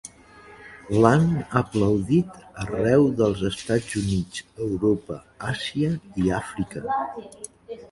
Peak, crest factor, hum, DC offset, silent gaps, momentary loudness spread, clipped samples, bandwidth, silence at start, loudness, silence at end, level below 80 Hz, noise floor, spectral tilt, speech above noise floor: -2 dBFS; 22 dB; none; under 0.1%; none; 19 LU; under 0.1%; 11.5 kHz; 0.05 s; -24 LUFS; 0.05 s; -46 dBFS; -48 dBFS; -6.5 dB/octave; 25 dB